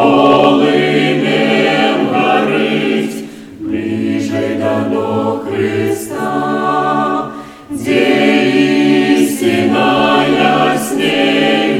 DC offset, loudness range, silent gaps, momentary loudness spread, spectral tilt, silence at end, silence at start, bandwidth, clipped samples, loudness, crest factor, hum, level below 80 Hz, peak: under 0.1%; 5 LU; none; 8 LU; -5 dB/octave; 0 s; 0 s; 16 kHz; under 0.1%; -12 LUFS; 12 dB; none; -50 dBFS; 0 dBFS